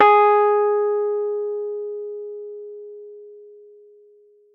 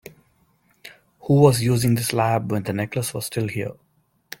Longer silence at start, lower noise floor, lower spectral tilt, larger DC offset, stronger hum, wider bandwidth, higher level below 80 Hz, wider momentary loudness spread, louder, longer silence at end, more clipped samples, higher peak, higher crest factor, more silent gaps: second, 0 s vs 0.85 s; second, -53 dBFS vs -62 dBFS; about the same, -5 dB/octave vs -6 dB/octave; neither; neither; second, 4.4 kHz vs 17 kHz; second, -76 dBFS vs -54 dBFS; first, 24 LU vs 15 LU; about the same, -20 LUFS vs -21 LUFS; first, 1.05 s vs 0.65 s; neither; about the same, -2 dBFS vs -2 dBFS; about the same, 20 dB vs 20 dB; neither